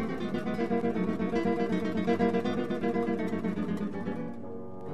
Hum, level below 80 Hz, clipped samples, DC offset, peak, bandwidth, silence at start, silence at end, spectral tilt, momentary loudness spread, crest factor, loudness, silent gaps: none; -60 dBFS; under 0.1%; 0.9%; -14 dBFS; 11.5 kHz; 0 s; 0 s; -8 dB/octave; 9 LU; 16 dB; -31 LUFS; none